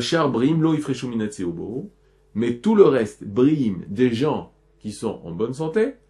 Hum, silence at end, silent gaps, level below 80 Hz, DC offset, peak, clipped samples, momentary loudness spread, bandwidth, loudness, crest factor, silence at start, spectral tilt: none; 0.15 s; none; -56 dBFS; under 0.1%; 0 dBFS; under 0.1%; 15 LU; 11.5 kHz; -22 LUFS; 20 dB; 0 s; -6.5 dB/octave